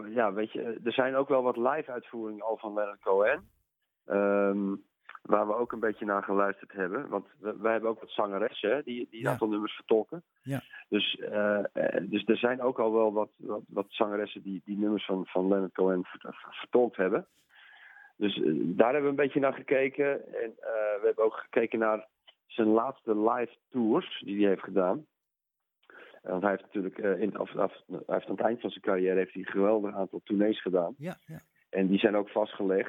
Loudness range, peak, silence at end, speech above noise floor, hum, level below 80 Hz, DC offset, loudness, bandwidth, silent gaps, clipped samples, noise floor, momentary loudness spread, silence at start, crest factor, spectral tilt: 3 LU; -8 dBFS; 0 s; 57 dB; none; -78 dBFS; under 0.1%; -30 LUFS; 12.5 kHz; none; under 0.1%; -86 dBFS; 10 LU; 0 s; 22 dB; -7.5 dB/octave